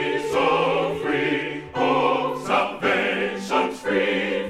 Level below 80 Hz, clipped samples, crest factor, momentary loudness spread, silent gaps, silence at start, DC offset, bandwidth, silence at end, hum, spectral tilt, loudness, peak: -56 dBFS; under 0.1%; 16 dB; 5 LU; none; 0 s; under 0.1%; 14 kHz; 0 s; none; -5 dB/octave; -22 LUFS; -6 dBFS